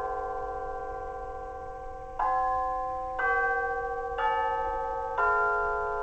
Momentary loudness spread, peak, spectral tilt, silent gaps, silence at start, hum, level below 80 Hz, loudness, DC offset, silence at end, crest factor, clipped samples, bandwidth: 13 LU; -14 dBFS; -5 dB/octave; none; 0 s; none; -46 dBFS; -30 LUFS; under 0.1%; 0 s; 16 dB; under 0.1%; 8.4 kHz